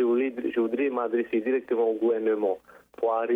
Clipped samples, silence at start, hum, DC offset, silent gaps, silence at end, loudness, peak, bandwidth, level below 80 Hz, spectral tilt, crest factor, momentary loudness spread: under 0.1%; 0 s; none; under 0.1%; none; 0 s; -27 LUFS; -16 dBFS; 3.8 kHz; -74 dBFS; -7.5 dB/octave; 10 dB; 4 LU